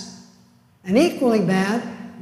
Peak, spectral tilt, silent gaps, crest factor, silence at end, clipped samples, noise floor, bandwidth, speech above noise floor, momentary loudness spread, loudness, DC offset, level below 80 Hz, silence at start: -4 dBFS; -6 dB/octave; none; 18 dB; 0 s; under 0.1%; -54 dBFS; 15 kHz; 36 dB; 19 LU; -20 LUFS; under 0.1%; -64 dBFS; 0 s